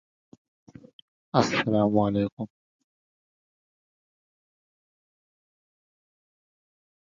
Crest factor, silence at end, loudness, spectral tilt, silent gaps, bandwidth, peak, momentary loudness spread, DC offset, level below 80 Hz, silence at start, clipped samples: 26 dB; 4.7 s; -25 LUFS; -6 dB/octave; 2.32-2.37 s; 7.6 kHz; -4 dBFS; 13 LU; under 0.1%; -62 dBFS; 1.35 s; under 0.1%